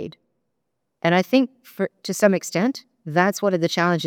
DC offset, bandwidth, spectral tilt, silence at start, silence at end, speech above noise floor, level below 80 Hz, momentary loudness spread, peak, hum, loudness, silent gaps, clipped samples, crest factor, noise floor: under 0.1%; 19.5 kHz; -5 dB/octave; 0 s; 0 s; 57 dB; -74 dBFS; 10 LU; -2 dBFS; none; -21 LUFS; none; under 0.1%; 20 dB; -78 dBFS